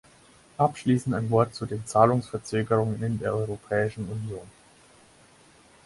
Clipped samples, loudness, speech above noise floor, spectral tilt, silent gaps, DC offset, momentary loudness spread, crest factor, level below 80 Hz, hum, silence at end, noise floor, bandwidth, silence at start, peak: under 0.1%; -26 LUFS; 30 dB; -7 dB/octave; none; under 0.1%; 12 LU; 22 dB; -56 dBFS; none; 1.35 s; -56 dBFS; 11.5 kHz; 0.6 s; -4 dBFS